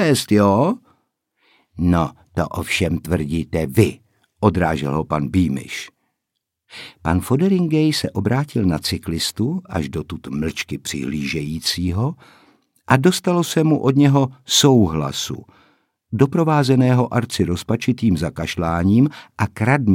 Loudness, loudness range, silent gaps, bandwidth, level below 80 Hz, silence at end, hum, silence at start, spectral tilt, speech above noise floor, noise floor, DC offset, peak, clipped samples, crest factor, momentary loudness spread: -19 LUFS; 6 LU; none; 17 kHz; -42 dBFS; 0 s; none; 0 s; -5.5 dB/octave; 61 dB; -79 dBFS; under 0.1%; 0 dBFS; under 0.1%; 18 dB; 10 LU